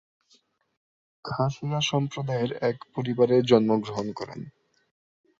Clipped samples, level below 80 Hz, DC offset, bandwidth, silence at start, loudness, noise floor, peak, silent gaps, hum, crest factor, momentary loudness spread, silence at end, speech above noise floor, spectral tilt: under 0.1%; -64 dBFS; under 0.1%; 7.8 kHz; 1.25 s; -26 LUFS; -65 dBFS; -6 dBFS; none; none; 22 dB; 17 LU; 0.9 s; 40 dB; -6 dB/octave